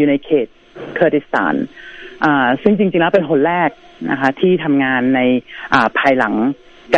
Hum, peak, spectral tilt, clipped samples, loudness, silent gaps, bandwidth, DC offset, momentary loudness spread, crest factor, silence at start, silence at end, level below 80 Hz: none; 0 dBFS; -7 dB/octave; under 0.1%; -15 LUFS; none; 7.6 kHz; under 0.1%; 14 LU; 16 dB; 0 s; 0 s; -52 dBFS